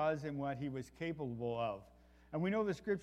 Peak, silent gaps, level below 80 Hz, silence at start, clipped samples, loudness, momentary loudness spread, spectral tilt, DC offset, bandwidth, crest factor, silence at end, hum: -22 dBFS; none; -66 dBFS; 0 s; under 0.1%; -40 LUFS; 8 LU; -7.5 dB/octave; under 0.1%; 13.5 kHz; 16 dB; 0 s; none